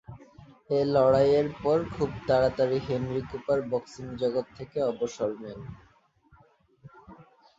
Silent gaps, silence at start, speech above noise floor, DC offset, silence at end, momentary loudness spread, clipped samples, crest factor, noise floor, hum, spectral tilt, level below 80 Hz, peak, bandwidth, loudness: none; 0.1 s; 35 dB; under 0.1%; 0.35 s; 17 LU; under 0.1%; 18 dB; -61 dBFS; none; -7 dB/octave; -54 dBFS; -10 dBFS; 7.8 kHz; -27 LUFS